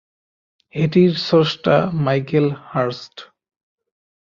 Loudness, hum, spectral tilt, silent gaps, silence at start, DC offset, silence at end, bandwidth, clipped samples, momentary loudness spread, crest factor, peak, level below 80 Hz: -18 LUFS; none; -7.5 dB/octave; none; 0.75 s; under 0.1%; 1 s; 7.2 kHz; under 0.1%; 12 LU; 18 dB; -2 dBFS; -56 dBFS